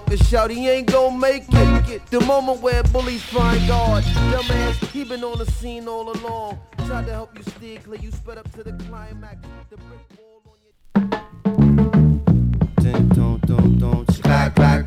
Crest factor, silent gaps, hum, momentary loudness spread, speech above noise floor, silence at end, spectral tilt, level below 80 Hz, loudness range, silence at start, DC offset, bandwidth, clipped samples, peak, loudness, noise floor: 16 dB; none; none; 19 LU; 36 dB; 0 s; -7 dB/octave; -26 dBFS; 15 LU; 0 s; under 0.1%; 15 kHz; under 0.1%; -2 dBFS; -18 LUFS; -54 dBFS